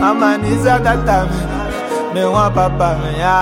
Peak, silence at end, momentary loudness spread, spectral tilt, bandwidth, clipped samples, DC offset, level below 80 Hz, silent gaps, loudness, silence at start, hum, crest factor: 0 dBFS; 0 s; 7 LU; -6.5 dB/octave; 16.5 kHz; under 0.1%; under 0.1%; -26 dBFS; none; -15 LUFS; 0 s; none; 14 dB